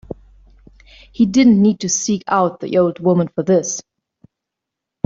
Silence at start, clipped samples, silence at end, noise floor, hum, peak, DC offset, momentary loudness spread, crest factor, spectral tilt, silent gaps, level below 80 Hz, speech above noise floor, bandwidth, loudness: 0.1 s; under 0.1%; 1.25 s; -82 dBFS; none; -2 dBFS; under 0.1%; 13 LU; 16 dB; -5.5 dB/octave; none; -50 dBFS; 67 dB; 7.8 kHz; -16 LUFS